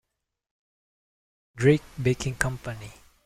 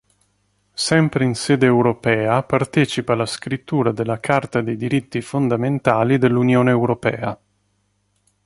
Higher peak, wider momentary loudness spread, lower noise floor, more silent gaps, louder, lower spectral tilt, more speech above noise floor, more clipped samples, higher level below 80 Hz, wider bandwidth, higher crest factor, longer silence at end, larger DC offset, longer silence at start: about the same, -4 dBFS vs -2 dBFS; first, 17 LU vs 8 LU; first, -83 dBFS vs -66 dBFS; neither; second, -26 LUFS vs -19 LUFS; about the same, -6 dB/octave vs -6 dB/octave; first, 58 dB vs 48 dB; neither; about the same, -50 dBFS vs -54 dBFS; first, 15 kHz vs 11.5 kHz; first, 26 dB vs 18 dB; second, 0.35 s vs 1.1 s; neither; first, 1.55 s vs 0.75 s